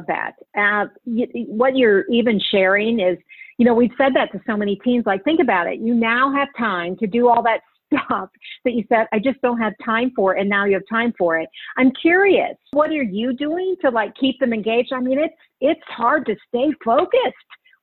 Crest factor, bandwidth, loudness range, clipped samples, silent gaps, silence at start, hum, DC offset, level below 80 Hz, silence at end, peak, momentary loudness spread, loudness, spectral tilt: 16 dB; 4.3 kHz; 3 LU; under 0.1%; none; 0 s; none; under 0.1%; -60 dBFS; 0.5 s; -4 dBFS; 8 LU; -19 LUFS; -9 dB/octave